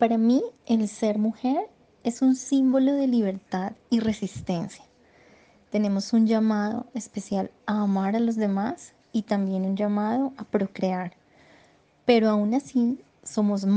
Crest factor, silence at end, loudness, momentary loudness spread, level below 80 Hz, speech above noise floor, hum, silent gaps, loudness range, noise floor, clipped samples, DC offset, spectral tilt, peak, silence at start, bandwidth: 18 dB; 0 s; -25 LUFS; 10 LU; -64 dBFS; 35 dB; none; none; 3 LU; -59 dBFS; under 0.1%; under 0.1%; -6.5 dB/octave; -6 dBFS; 0 s; 9.4 kHz